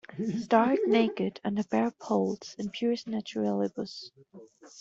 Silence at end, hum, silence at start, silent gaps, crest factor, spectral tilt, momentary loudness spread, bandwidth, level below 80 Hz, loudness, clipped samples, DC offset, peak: 0 s; none; 0.1 s; none; 20 dB; -6 dB/octave; 13 LU; 7.6 kHz; -72 dBFS; -29 LUFS; under 0.1%; under 0.1%; -8 dBFS